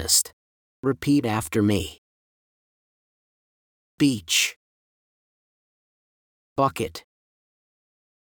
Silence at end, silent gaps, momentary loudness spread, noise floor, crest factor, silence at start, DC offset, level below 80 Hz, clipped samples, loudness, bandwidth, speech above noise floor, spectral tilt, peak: 1.25 s; 0.33-0.83 s, 1.98-3.98 s, 4.56-6.56 s; 12 LU; under -90 dBFS; 22 dB; 0 s; under 0.1%; -56 dBFS; under 0.1%; -23 LUFS; over 20 kHz; over 67 dB; -3.5 dB/octave; -6 dBFS